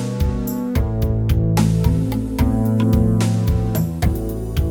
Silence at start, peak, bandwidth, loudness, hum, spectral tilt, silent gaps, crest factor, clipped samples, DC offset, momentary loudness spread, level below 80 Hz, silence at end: 0 s; -4 dBFS; 18.5 kHz; -19 LUFS; none; -7.5 dB/octave; none; 14 dB; under 0.1%; under 0.1%; 6 LU; -24 dBFS; 0 s